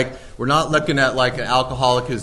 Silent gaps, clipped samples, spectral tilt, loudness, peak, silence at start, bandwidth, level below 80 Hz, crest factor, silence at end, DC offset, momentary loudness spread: none; under 0.1%; -4.5 dB/octave; -18 LUFS; -4 dBFS; 0 s; 12 kHz; -40 dBFS; 16 dB; 0 s; under 0.1%; 4 LU